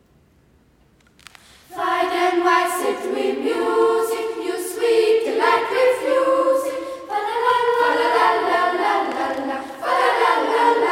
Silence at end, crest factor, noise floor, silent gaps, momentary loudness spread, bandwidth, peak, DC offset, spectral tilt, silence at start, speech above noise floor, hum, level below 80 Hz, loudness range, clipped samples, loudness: 0 s; 16 dB; -56 dBFS; none; 9 LU; 16.5 kHz; -4 dBFS; under 0.1%; -2.5 dB/octave; 1.7 s; 38 dB; none; -62 dBFS; 3 LU; under 0.1%; -19 LUFS